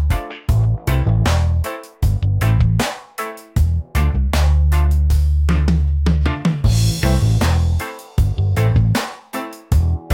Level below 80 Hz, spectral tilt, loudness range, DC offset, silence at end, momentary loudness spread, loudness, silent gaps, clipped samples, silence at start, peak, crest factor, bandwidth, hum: -20 dBFS; -6 dB/octave; 2 LU; under 0.1%; 0 s; 8 LU; -18 LUFS; none; under 0.1%; 0 s; -4 dBFS; 12 dB; 17 kHz; none